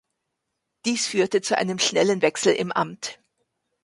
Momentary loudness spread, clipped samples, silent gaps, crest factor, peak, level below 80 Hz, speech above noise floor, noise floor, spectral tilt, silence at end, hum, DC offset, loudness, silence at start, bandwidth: 9 LU; under 0.1%; none; 18 dB; -6 dBFS; -70 dBFS; 57 dB; -80 dBFS; -3 dB/octave; 0.7 s; none; under 0.1%; -22 LUFS; 0.85 s; 11.5 kHz